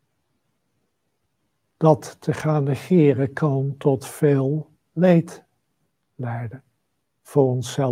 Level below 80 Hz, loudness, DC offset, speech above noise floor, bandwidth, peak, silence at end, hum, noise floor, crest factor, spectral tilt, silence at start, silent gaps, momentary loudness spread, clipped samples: -66 dBFS; -21 LUFS; under 0.1%; 55 dB; 15.5 kHz; -2 dBFS; 0 s; none; -75 dBFS; 20 dB; -8 dB/octave; 1.8 s; none; 13 LU; under 0.1%